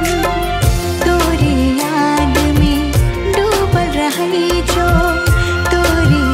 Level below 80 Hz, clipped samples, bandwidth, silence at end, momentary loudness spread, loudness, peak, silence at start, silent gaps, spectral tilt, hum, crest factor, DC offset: -20 dBFS; under 0.1%; 16.5 kHz; 0 s; 3 LU; -14 LUFS; 0 dBFS; 0 s; none; -5.5 dB/octave; none; 12 dB; under 0.1%